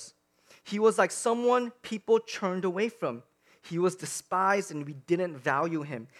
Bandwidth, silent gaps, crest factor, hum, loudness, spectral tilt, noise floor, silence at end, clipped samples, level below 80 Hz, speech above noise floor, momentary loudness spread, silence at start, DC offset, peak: 14.5 kHz; none; 20 dB; none; -29 LUFS; -4.5 dB/octave; -61 dBFS; 0.15 s; under 0.1%; -82 dBFS; 33 dB; 12 LU; 0 s; under 0.1%; -10 dBFS